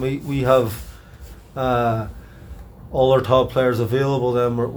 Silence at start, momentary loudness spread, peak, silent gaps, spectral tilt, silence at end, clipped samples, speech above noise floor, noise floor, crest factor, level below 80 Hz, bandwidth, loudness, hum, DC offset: 0 s; 19 LU; -2 dBFS; none; -7 dB/octave; 0 s; under 0.1%; 22 dB; -40 dBFS; 18 dB; -40 dBFS; over 20 kHz; -19 LUFS; none; under 0.1%